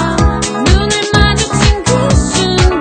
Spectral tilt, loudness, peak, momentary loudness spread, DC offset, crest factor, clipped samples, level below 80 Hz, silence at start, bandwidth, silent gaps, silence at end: -4.5 dB/octave; -11 LUFS; 0 dBFS; 2 LU; under 0.1%; 10 dB; 0.4%; -16 dBFS; 0 s; 9.4 kHz; none; 0 s